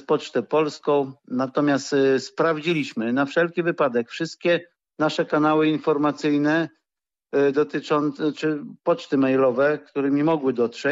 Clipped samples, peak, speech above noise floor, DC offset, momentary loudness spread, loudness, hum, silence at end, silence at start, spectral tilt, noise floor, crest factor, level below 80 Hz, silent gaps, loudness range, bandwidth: under 0.1%; -10 dBFS; 67 dB; under 0.1%; 6 LU; -22 LUFS; none; 0 s; 0.1 s; -6 dB/octave; -89 dBFS; 12 dB; -74 dBFS; none; 1 LU; 8 kHz